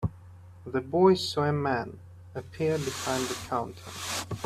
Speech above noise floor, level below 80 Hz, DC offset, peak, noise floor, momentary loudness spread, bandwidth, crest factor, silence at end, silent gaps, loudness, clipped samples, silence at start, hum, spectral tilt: 21 dB; -56 dBFS; under 0.1%; -8 dBFS; -49 dBFS; 19 LU; 15 kHz; 20 dB; 0 s; none; -29 LUFS; under 0.1%; 0 s; none; -5 dB/octave